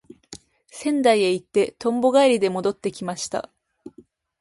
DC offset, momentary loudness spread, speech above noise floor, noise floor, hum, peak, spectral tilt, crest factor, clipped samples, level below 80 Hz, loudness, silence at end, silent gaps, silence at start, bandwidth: under 0.1%; 25 LU; 32 dB; -53 dBFS; none; -4 dBFS; -4.5 dB/octave; 18 dB; under 0.1%; -64 dBFS; -21 LUFS; 0.5 s; none; 0.3 s; 11.5 kHz